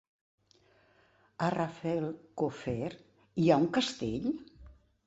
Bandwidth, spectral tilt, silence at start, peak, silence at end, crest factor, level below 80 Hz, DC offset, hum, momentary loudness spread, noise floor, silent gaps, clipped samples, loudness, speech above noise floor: 8.2 kHz; -6 dB/octave; 1.4 s; -10 dBFS; 0.35 s; 24 dB; -62 dBFS; under 0.1%; none; 14 LU; -67 dBFS; none; under 0.1%; -33 LUFS; 35 dB